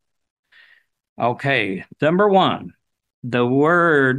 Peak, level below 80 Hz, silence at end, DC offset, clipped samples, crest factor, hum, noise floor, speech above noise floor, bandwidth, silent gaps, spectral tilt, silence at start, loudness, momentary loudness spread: -4 dBFS; -64 dBFS; 0 s; under 0.1%; under 0.1%; 16 dB; none; -55 dBFS; 37 dB; 9.8 kHz; 3.14-3.22 s; -7.5 dB/octave; 1.2 s; -18 LUFS; 11 LU